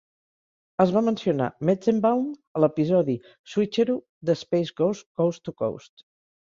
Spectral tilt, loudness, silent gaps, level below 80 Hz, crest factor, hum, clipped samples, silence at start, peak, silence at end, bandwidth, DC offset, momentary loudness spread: -7.5 dB/octave; -25 LUFS; 2.47-2.55 s, 3.39-3.44 s, 4.09-4.21 s, 5.06-5.15 s; -66 dBFS; 20 dB; none; under 0.1%; 0.8 s; -6 dBFS; 0.8 s; 7.6 kHz; under 0.1%; 9 LU